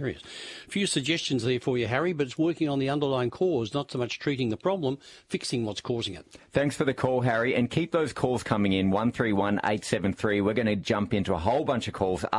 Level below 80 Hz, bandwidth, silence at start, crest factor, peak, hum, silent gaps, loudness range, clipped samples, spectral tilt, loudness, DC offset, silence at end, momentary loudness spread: -56 dBFS; 11.5 kHz; 0 s; 18 dB; -8 dBFS; none; none; 3 LU; under 0.1%; -5.5 dB/octave; -27 LUFS; under 0.1%; 0 s; 6 LU